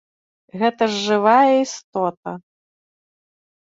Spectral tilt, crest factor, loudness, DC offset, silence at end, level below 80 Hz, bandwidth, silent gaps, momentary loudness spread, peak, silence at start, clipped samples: -4.5 dB/octave; 18 dB; -18 LUFS; under 0.1%; 1.4 s; -70 dBFS; 7.8 kHz; 1.84-1.92 s, 2.17-2.23 s; 19 LU; -2 dBFS; 0.55 s; under 0.1%